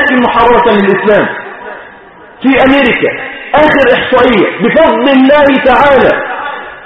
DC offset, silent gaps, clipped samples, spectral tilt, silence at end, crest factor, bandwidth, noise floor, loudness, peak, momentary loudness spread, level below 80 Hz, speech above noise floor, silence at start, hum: under 0.1%; none; 0.4%; -7 dB/octave; 0 s; 8 dB; 6.2 kHz; -34 dBFS; -7 LUFS; 0 dBFS; 14 LU; -36 dBFS; 27 dB; 0 s; none